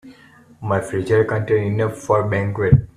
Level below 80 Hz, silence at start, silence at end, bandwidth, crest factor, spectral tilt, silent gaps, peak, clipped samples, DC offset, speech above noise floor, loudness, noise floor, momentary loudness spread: -40 dBFS; 0.05 s; 0.1 s; 11 kHz; 18 dB; -8 dB/octave; none; 0 dBFS; under 0.1%; under 0.1%; 30 dB; -19 LUFS; -48 dBFS; 6 LU